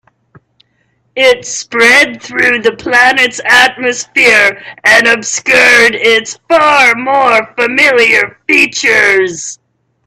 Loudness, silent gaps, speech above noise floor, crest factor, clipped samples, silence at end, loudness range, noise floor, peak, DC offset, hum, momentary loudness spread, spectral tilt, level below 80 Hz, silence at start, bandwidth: -7 LUFS; none; 49 dB; 10 dB; 0.4%; 0.5 s; 2 LU; -58 dBFS; 0 dBFS; under 0.1%; none; 7 LU; -1.5 dB/octave; -50 dBFS; 1.15 s; 16 kHz